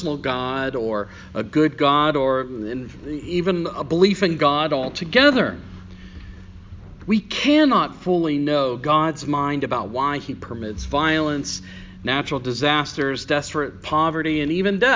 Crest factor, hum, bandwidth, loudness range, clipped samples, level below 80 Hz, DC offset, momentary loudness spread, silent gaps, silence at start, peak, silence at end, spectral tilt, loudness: 20 dB; none; 7.6 kHz; 3 LU; under 0.1%; -44 dBFS; under 0.1%; 14 LU; none; 0 s; 0 dBFS; 0 s; -5.5 dB/octave; -21 LUFS